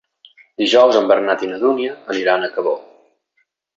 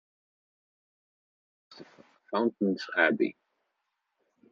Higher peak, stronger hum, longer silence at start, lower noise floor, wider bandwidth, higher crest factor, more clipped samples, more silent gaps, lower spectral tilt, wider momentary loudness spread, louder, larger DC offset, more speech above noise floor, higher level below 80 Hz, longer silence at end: first, -2 dBFS vs -10 dBFS; neither; second, 0.6 s vs 1.7 s; second, -67 dBFS vs -82 dBFS; about the same, 7.8 kHz vs 7.2 kHz; second, 16 dB vs 24 dB; neither; neither; about the same, -3.5 dB/octave vs -3.5 dB/octave; first, 11 LU vs 7 LU; first, -16 LUFS vs -28 LUFS; neither; about the same, 51 dB vs 54 dB; first, -66 dBFS vs -84 dBFS; second, 0.95 s vs 1.2 s